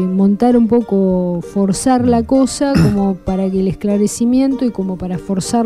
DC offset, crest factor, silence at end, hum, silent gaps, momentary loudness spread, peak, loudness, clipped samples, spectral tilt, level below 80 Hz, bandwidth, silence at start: 0.3%; 12 dB; 0 s; none; none; 7 LU; -2 dBFS; -15 LUFS; under 0.1%; -6.5 dB/octave; -36 dBFS; 13.5 kHz; 0 s